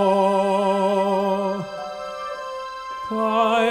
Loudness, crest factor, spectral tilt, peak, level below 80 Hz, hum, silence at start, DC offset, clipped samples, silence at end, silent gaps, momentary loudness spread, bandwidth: -22 LUFS; 14 dB; -6 dB/octave; -6 dBFS; -60 dBFS; none; 0 s; under 0.1%; under 0.1%; 0 s; none; 13 LU; 16 kHz